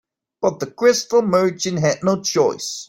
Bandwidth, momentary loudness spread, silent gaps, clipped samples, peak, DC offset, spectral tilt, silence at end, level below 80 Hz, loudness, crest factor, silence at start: 16.5 kHz; 6 LU; none; under 0.1%; -2 dBFS; under 0.1%; -4.5 dB/octave; 0.05 s; -60 dBFS; -19 LUFS; 16 dB; 0.4 s